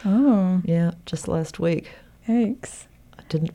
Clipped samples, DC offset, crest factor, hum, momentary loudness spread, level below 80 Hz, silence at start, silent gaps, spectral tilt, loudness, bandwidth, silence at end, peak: under 0.1%; under 0.1%; 14 dB; none; 16 LU; -52 dBFS; 0 s; none; -7.5 dB/octave; -23 LUFS; 11.5 kHz; 0.05 s; -8 dBFS